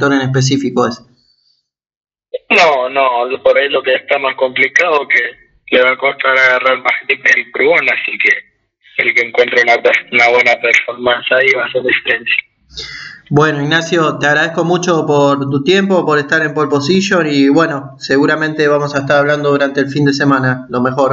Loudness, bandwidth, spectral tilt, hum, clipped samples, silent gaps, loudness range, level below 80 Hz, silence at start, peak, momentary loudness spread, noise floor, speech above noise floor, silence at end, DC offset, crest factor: -12 LUFS; 8 kHz; -5 dB/octave; none; under 0.1%; 1.96-2.01 s; 3 LU; -54 dBFS; 0 s; 0 dBFS; 7 LU; -62 dBFS; 50 dB; 0 s; under 0.1%; 12 dB